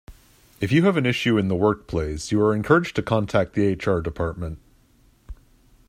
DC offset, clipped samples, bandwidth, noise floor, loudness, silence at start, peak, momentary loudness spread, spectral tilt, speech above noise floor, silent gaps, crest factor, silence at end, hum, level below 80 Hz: under 0.1%; under 0.1%; 15.5 kHz; -57 dBFS; -22 LUFS; 0.1 s; -2 dBFS; 9 LU; -6.5 dB/octave; 36 dB; none; 20 dB; 0.55 s; none; -44 dBFS